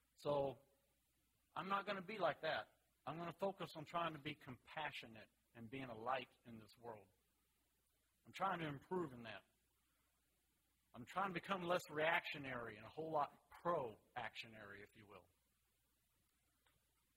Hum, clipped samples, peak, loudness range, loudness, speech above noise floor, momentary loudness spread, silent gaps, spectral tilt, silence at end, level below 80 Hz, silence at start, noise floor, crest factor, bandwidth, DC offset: none; under 0.1%; -24 dBFS; 7 LU; -46 LUFS; 37 dB; 19 LU; none; -5.5 dB/octave; 1.95 s; -82 dBFS; 0.2 s; -84 dBFS; 24 dB; 16 kHz; under 0.1%